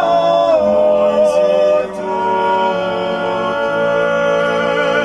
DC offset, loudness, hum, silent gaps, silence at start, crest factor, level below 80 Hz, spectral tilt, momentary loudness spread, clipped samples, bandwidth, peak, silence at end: under 0.1%; -14 LUFS; none; none; 0 s; 12 dB; -50 dBFS; -5 dB/octave; 6 LU; under 0.1%; 11 kHz; -2 dBFS; 0 s